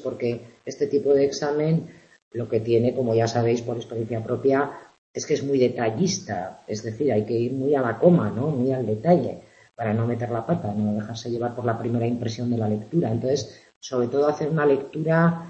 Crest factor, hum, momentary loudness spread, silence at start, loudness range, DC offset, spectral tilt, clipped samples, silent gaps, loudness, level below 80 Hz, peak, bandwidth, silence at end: 20 dB; none; 11 LU; 0 s; 3 LU; under 0.1%; -6.5 dB/octave; under 0.1%; 2.22-2.31 s, 4.98-5.14 s, 13.76-13.81 s; -24 LUFS; -62 dBFS; -4 dBFS; 8.2 kHz; 0 s